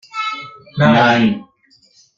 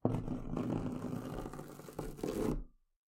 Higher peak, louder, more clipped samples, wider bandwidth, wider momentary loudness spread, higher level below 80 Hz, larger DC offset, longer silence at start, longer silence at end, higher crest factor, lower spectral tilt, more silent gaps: first, -2 dBFS vs -16 dBFS; first, -14 LUFS vs -41 LUFS; neither; second, 7.4 kHz vs 16.5 kHz; first, 17 LU vs 10 LU; about the same, -54 dBFS vs -50 dBFS; neither; about the same, 0.15 s vs 0.05 s; first, 0.75 s vs 0.45 s; second, 16 dB vs 24 dB; about the same, -6.5 dB/octave vs -7.5 dB/octave; neither